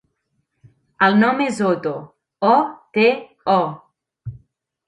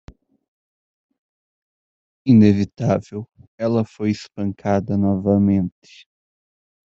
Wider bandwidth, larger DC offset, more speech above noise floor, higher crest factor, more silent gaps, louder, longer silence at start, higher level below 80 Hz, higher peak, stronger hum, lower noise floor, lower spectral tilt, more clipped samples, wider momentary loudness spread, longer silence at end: first, 11.5 kHz vs 7.6 kHz; neither; second, 54 dB vs over 72 dB; about the same, 18 dB vs 18 dB; second, none vs 3.47-3.58 s; about the same, -18 LUFS vs -19 LUFS; second, 1 s vs 2.25 s; about the same, -58 dBFS vs -56 dBFS; about the same, -2 dBFS vs -2 dBFS; neither; second, -71 dBFS vs under -90 dBFS; second, -6 dB/octave vs -8.5 dB/octave; neither; first, 21 LU vs 14 LU; second, 0.5 s vs 1.15 s